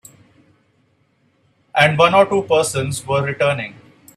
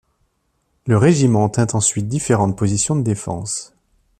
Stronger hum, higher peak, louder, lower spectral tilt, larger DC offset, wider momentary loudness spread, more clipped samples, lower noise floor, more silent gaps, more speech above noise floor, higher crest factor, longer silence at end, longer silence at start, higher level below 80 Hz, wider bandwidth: neither; about the same, 0 dBFS vs -2 dBFS; about the same, -16 LUFS vs -17 LUFS; about the same, -4.5 dB/octave vs -5.5 dB/octave; neither; about the same, 11 LU vs 10 LU; neither; second, -61 dBFS vs -67 dBFS; neither; second, 45 dB vs 50 dB; about the same, 20 dB vs 16 dB; about the same, 0.45 s vs 0.55 s; first, 1.75 s vs 0.85 s; second, -56 dBFS vs -48 dBFS; about the same, 14.5 kHz vs 13.5 kHz